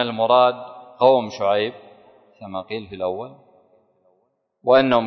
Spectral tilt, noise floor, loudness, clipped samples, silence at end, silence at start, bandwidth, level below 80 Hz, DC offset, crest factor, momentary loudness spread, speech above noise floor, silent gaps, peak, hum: -6 dB/octave; -68 dBFS; -20 LUFS; under 0.1%; 0 s; 0 s; 6.4 kHz; -62 dBFS; under 0.1%; 18 dB; 18 LU; 49 dB; none; -2 dBFS; none